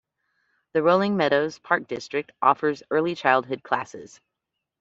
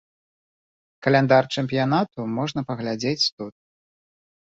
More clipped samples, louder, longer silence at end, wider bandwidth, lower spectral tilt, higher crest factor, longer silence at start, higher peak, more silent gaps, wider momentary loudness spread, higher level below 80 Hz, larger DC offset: neither; about the same, -23 LUFS vs -22 LUFS; second, 0.75 s vs 1.1 s; about the same, 8 kHz vs 8 kHz; about the same, -5.5 dB/octave vs -5.5 dB/octave; about the same, 22 dB vs 22 dB; second, 0.75 s vs 1 s; about the same, -4 dBFS vs -4 dBFS; second, none vs 3.32-3.38 s; about the same, 9 LU vs 10 LU; second, -68 dBFS vs -62 dBFS; neither